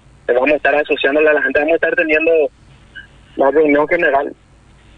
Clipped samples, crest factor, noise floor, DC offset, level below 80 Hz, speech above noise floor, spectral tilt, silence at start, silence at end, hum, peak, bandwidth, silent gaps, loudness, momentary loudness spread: under 0.1%; 12 dB; -46 dBFS; under 0.1%; -48 dBFS; 32 dB; -6 dB/octave; 0.3 s; 0.65 s; none; -4 dBFS; 5.6 kHz; none; -14 LUFS; 6 LU